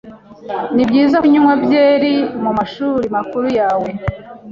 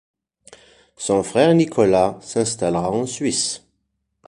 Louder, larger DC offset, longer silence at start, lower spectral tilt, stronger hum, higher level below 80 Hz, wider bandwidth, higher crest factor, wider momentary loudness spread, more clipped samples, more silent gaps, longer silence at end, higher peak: first, -14 LUFS vs -19 LUFS; neither; second, 0.05 s vs 1 s; first, -7.5 dB/octave vs -4.5 dB/octave; neither; first, -42 dBFS vs -52 dBFS; second, 7 kHz vs 11.5 kHz; second, 12 dB vs 18 dB; first, 13 LU vs 8 LU; neither; neither; second, 0 s vs 0.7 s; about the same, -2 dBFS vs -2 dBFS